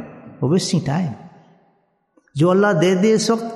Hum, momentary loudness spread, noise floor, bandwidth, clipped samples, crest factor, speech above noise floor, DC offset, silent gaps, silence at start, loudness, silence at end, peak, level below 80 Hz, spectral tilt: none; 16 LU; -63 dBFS; 12.5 kHz; under 0.1%; 16 dB; 46 dB; under 0.1%; none; 0 s; -18 LUFS; 0 s; -4 dBFS; -60 dBFS; -5.5 dB/octave